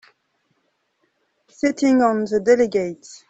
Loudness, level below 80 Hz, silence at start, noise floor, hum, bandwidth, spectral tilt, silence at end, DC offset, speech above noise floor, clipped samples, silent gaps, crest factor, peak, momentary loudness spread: -19 LUFS; -60 dBFS; 1.65 s; -69 dBFS; none; 8.2 kHz; -5.5 dB/octave; 0.15 s; under 0.1%; 51 dB; under 0.1%; none; 18 dB; -2 dBFS; 8 LU